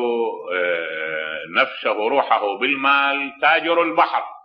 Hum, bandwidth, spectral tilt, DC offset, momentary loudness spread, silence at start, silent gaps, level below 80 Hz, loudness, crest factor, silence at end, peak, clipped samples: none; 5.8 kHz; -5.5 dB/octave; under 0.1%; 8 LU; 0 s; none; -76 dBFS; -19 LUFS; 18 dB; 0.05 s; -2 dBFS; under 0.1%